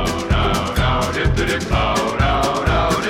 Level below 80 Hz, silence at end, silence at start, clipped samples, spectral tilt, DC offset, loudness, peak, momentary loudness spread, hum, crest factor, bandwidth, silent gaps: -24 dBFS; 0 s; 0 s; under 0.1%; -5 dB/octave; under 0.1%; -18 LUFS; -4 dBFS; 2 LU; none; 12 dB; 16.5 kHz; none